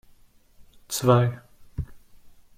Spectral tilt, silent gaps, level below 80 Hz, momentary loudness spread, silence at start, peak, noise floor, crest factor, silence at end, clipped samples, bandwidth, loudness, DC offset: -6 dB/octave; none; -48 dBFS; 20 LU; 0.9 s; -6 dBFS; -55 dBFS; 22 dB; 0.6 s; under 0.1%; 16 kHz; -24 LUFS; under 0.1%